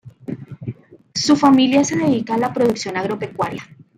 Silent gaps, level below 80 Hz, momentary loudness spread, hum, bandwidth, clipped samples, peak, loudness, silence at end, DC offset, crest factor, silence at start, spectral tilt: none; -58 dBFS; 20 LU; none; 11.5 kHz; under 0.1%; -4 dBFS; -17 LUFS; 0.35 s; under 0.1%; 16 dB; 0.05 s; -4.5 dB/octave